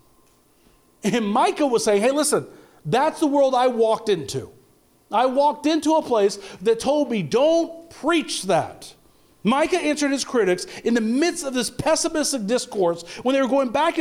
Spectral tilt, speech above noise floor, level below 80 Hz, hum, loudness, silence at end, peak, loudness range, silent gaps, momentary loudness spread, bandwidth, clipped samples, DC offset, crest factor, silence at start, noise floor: -4 dB/octave; 37 dB; -58 dBFS; none; -21 LUFS; 0 s; -10 dBFS; 2 LU; none; 7 LU; 16 kHz; under 0.1%; under 0.1%; 12 dB; 1.05 s; -58 dBFS